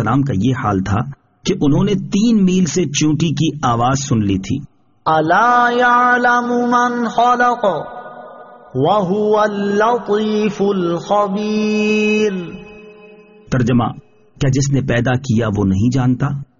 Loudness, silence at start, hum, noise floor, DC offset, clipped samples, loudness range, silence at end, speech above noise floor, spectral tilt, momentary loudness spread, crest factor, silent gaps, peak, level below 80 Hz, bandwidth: -15 LUFS; 0 s; none; -42 dBFS; under 0.1%; under 0.1%; 4 LU; 0.15 s; 27 dB; -5.5 dB/octave; 10 LU; 14 dB; none; -2 dBFS; -42 dBFS; 7.4 kHz